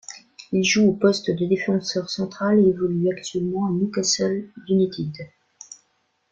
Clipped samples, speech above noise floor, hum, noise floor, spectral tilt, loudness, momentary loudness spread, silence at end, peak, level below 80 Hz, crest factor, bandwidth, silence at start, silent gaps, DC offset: under 0.1%; 47 dB; none; -69 dBFS; -5 dB/octave; -22 LUFS; 21 LU; 0.6 s; -4 dBFS; -60 dBFS; 18 dB; 7.8 kHz; 0.1 s; none; under 0.1%